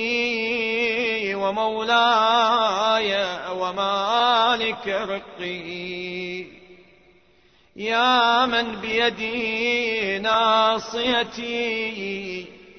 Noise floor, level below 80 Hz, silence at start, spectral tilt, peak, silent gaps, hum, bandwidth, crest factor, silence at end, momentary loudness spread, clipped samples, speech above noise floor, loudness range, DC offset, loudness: -58 dBFS; -60 dBFS; 0 s; -3 dB/octave; -8 dBFS; none; none; 6.6 kHz; 16 dB; 0 s; 13 LU; under 0.1%; 36 dB; 5 LU; under 0.1%; -21 LUFS